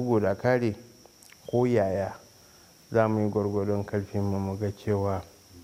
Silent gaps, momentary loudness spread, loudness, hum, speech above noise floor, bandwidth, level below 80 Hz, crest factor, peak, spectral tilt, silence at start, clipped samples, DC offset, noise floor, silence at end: none; 9 LU; -28 LUFS; none; 28 dB; 15.5 kHz; -60 dBFS; 20 dB; -8 dBFS; -8 dB/octave; 0 s; under 0.1%; under 0.1%; -55 dBFS; 0 s